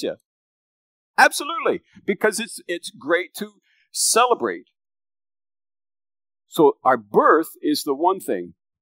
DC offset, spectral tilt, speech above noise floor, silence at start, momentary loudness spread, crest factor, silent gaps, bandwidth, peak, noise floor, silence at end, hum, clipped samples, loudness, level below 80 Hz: under 0.1%; -2.5 dB/octave; over 70 dB; 0 s; 14 LU; 20 dB; 0.25-1.14 s; 16 kHz; -2 dBFS; under -90 dBFS; 0.3 s; none; under 0.1%; -20 LUFS; -78 dBFS